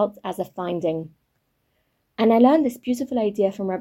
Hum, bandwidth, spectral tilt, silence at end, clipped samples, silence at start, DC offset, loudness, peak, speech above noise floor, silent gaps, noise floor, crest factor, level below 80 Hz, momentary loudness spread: none; 16.5 kHz; -7 dB/octave; 0 s; under 0.1%; 0 s; under 0.1%; -22 LUFS; -4 dBFS; 50 dB; none; -71 dBFS; 18 dB; -64 dBFS; 15 LU